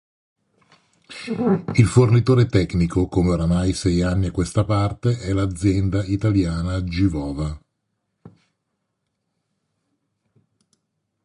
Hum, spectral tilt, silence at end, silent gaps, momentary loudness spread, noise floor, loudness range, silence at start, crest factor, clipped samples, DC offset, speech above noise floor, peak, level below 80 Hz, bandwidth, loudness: none; -7 dB/octave; 2.95 s; none; 10 LU; -76 dBFS; 10 LU; 1.1 s; 18 dB; under 0.1%; under 0.1%; 57 dB; -2 dBFS; -36 dBFS; 11.5 kHz; -20 LUFS